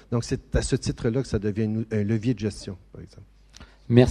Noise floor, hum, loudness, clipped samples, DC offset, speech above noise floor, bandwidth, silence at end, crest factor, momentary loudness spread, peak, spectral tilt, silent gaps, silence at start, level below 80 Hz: -49 dBFS; none; -26 LUFS; under 0.1%; under 0.1%; 23 dB; 10.5 kHz; 0 s; 24 dB; 16 LU; 0 dBFS; -6.5 dB/octave; none; 0.1 s; -40 dBFS